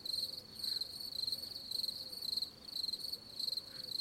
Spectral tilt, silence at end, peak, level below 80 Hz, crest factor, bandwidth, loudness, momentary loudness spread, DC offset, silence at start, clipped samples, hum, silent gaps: -1 dB/octave; 0 s; -26 dBFS; -74 dBFS; 16 dB; 16.5 kHz; -39 LUFS; 3 LU; under 0.1%; 0 s; under 0.1%; none; none